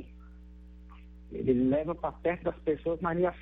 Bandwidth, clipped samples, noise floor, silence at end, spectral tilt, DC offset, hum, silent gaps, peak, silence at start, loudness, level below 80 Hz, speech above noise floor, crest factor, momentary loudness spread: 3.9 kHz; under 0.1%; -50 dBFS; 0 s; -10.5 dB/octave; under 0.1%; 60 Hz at -50 dBFS; none; -14 dBFS; 0 s; -30 LUFS; -50 dBFS; 20 dB; 18 dB; 25 LU